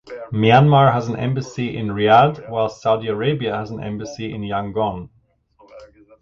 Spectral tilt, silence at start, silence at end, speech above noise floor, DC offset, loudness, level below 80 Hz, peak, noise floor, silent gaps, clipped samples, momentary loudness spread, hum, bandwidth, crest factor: -7 dB/octave; 0.05 s; 0.35 s; 37 dB; under 0.1%; -18 LUFS; -50 dBFS; 0 dBFS; -55 dBFS; none; under 0.1%; 15 LU; none; 7.2 kHz; 18 dB